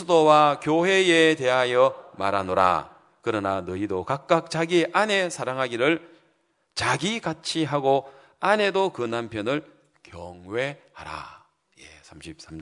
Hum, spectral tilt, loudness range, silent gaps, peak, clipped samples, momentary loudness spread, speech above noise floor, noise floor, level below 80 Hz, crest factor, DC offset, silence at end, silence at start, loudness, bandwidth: none; -4.5 dB/octave; 8 LU; none; -2 dBFS; under 0.1%; 19 LU; 44 dB; -68 dBFS; -64 dBFS; 22 dB; under 0.1%; 0 s; 0 s; -23 LUFS; 11 kHz